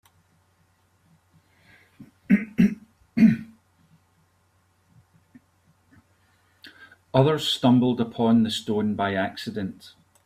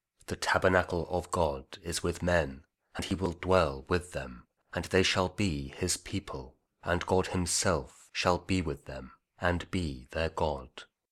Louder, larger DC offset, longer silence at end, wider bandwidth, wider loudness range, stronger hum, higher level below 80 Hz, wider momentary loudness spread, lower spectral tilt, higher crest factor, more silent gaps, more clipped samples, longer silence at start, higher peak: first, -23 LUFS vs -31 LUFS; neither; first, 0.5 s vs 0.3 s; about the same, 15 kHz vs 15.5 kHz; first, 6 LU vs 2 LU; neither; second, -62 dBFS vs -48 dBFS; about the same, 13 LU vs 13 LU; first, -6.5 dB/octave vs -4 dB/octave; about the same, 22 dB vs 22 dB; neither; neither; first, 2 s vs 0.3 s; first, -4 dBFS vs -10 dBFS